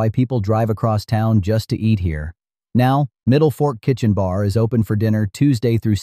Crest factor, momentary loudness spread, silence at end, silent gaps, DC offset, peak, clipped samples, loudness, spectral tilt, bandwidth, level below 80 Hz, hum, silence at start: 12 dB; 4 LU; 0 s; none; under 0.1%; -4 dBFS; under 0.1%; -18 LUFS; -8 dB/octave; 14 kHz; -40 dBFS; none; 0 s